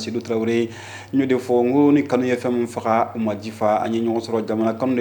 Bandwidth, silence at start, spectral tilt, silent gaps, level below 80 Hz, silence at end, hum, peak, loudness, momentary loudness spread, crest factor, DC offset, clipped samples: 19 kHz; 0 s; -6.5 dB/octave; none; -66 dBFS; 0 s; none; -4 dBFS; -21 LUFS; 8 LU; 16 dB; under 0.1%; under 0.1%